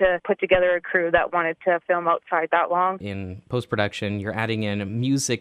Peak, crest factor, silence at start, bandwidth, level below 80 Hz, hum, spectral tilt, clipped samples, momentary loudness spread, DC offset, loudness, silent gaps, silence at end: -4 dBFS; 20 dB; 0 s; 14 kHz; -50 dBFS; none; -5 dB/octave; under 0.1%; 8 LU; under 0.1%; -23 LUFS; none; 0 s